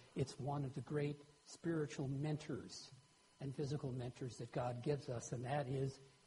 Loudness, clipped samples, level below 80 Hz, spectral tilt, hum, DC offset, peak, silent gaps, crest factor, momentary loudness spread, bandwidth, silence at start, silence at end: -45 LUFS; under 0.1%; -72 dBFS; -6.5 dB/octave; none; under 0.1%; -26 dBFS; none; 18 dB; 8 LU; 11 kHz; 0 s; 0.15 s